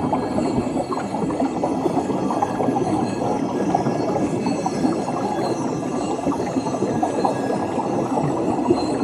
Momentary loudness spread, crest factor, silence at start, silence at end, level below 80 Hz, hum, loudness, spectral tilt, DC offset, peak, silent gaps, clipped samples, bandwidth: 3 LU; 16 dB; 0 s; 0 s; -52 dBFS; none; -22 LUFS; -6.5 dB/octave; under 0.1%; -4 dBFS; none; under 0.1%; 13.5 kHz